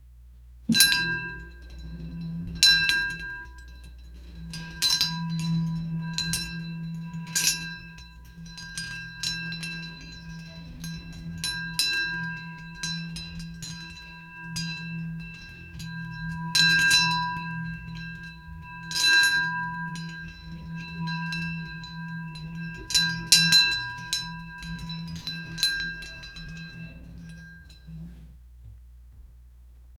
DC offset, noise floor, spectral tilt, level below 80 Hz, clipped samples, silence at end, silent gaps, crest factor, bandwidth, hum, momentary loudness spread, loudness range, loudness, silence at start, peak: under 0.1%; -50 dBFS; -1.5 dB/octave; -48 dBFS; under 0.1%; 0 s; none; 30 dB; over 20 kHz; none; 24 LU; 12 LU; -25 LUFS; 0 s; 0 dBFS